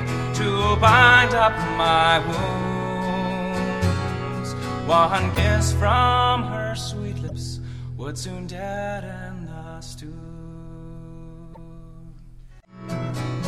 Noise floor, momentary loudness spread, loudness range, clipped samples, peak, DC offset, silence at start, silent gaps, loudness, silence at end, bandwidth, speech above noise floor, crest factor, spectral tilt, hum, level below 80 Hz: -44 dBFS; 22 LU; 20 LU; under 0.1%; -2 dBFS; under 0.1%; 0 s; none; -21 LUFS; 0 s; 15.5 kHz; 24 dB; 22 dB; -5 dB/octave; none; -36 dBFS